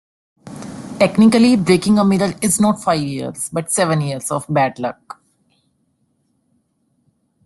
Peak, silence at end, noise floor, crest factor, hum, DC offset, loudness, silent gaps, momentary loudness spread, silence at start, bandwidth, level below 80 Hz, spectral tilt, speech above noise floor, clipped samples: -2 dBFS; 2.55 s; -65 dBFS; 16 dB; none; under 0.1%; -16 LUFS; none; 20 LU; 0.45 s; 12.5 kHz; -54 dBFS; -5 dB/octave; 49 dB; under 0.1%